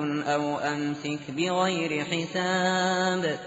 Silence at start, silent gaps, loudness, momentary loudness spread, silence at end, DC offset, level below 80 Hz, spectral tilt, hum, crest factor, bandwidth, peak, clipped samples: 0 s; none; -27 LUFS; 6 LU; 0 s; under 0.1%; -68 dBFS; -3.5 dB/octave; none; 14 dB; 8 kHz; -12 dBFS; under 0.1%